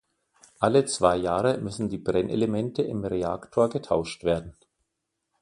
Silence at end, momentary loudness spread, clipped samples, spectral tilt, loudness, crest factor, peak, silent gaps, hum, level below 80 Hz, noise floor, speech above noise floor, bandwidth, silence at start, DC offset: 0.9 s; 6 LU; under 0.1%; -5.5 dB/octave; -26 LUFS; 22 dB; -4 dBFS; none; none; -52 dBFS; -81 dBFS; 56 dB; 11.5 kHz; 0.6 s; under 0.1%